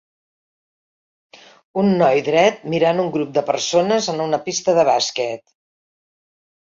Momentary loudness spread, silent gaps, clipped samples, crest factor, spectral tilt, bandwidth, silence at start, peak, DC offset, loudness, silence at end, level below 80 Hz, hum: 7 LU; none; under 0.1%; 16 dB; -4.5 dB/octave; 7.6 kHz; 1.75 s; -4 dBFS; under 0.1%; -18 LUFS; 1.25 s; -64 dBFS; none